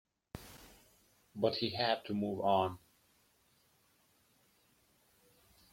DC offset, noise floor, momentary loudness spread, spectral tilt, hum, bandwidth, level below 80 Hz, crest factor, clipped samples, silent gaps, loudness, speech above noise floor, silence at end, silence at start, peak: under 0.1%; -72 dBFS; 22 LU; -6 dB/octave; none; 16.5 kHz; -70 dBFS; 22 dB; under 0.1%; none; -35 LUFS; 38 dB; 2.95 s; 0.35 s; -18 dBFS